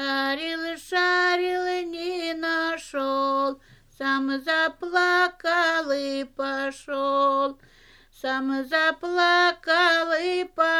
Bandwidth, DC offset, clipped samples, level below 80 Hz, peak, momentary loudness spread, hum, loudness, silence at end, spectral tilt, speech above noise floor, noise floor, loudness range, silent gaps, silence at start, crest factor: 14 kHz; under 0.1%; under 0.1%; -62 dBFS; -6 dBFS; 9 LU; none; -24 LUFS; 0 s; -2 dB/octave; 31 dB; -54 dBFS; 3 LU; none; 0 s; 18 dB